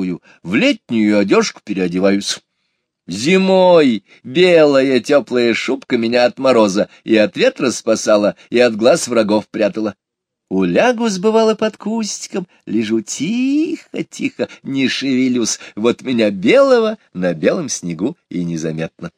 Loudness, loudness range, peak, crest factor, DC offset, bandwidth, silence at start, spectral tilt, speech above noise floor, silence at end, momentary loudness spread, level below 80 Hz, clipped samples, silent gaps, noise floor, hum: -15 LUFS; 5 LU; 0 dBFS; 16 dB; under 0.1%; 14 kHz; 0 s; -4.5 dB/octave; 55 dB; 0.1 s; 11 LU; -62 dBFS; under 0.1%; none; -70 dBFS; none